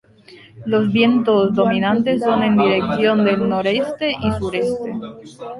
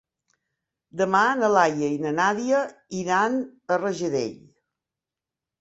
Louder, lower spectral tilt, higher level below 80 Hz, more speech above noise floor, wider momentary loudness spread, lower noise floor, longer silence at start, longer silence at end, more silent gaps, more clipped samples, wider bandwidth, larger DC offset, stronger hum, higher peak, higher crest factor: first, -17 LUFS vs -23 LUFS; first, -7 dB/octave vs -5 dB/octave; first, -46 dBFS vs -68 dBFS; second, 28 dB vs 65 dB; about the same, 11 LU vs 11 LU; second, -45 dBFS vs -89 dBFS; second, 0.3 s vs 0.95 s; second, 0 s vs 1.25 s; neither; neither; first, 11.5 kHz vs 8 kHz; neither; neither; about the same, -4 dBFS vs -4 dBFS; second, 14 dB vs 20 dB